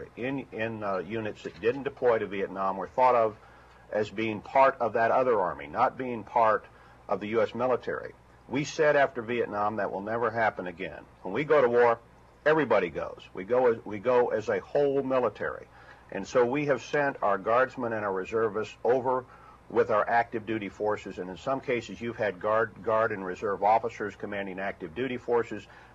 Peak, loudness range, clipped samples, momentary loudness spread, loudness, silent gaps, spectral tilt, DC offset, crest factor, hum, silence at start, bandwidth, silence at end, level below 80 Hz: -8 dBFS; 3 LU; under 0.1%; 11 LU; -28 LUFS; none; -6 dB/octave; under 0.1%; 20 dB; none; 0 s; 7.8 kHz; 0.15 s; -60 dBFS